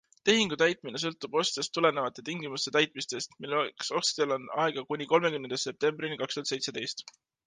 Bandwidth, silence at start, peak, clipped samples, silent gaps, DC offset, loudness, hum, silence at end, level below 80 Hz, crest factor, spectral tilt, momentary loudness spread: 10 kHz; 0.25 s; -6 dBFS; under 0.1%; none; under 0.1%; -30 LUFS; none; 0.35 s; -74 dBFS; 24 dB; -3 dB/octave; 9 LU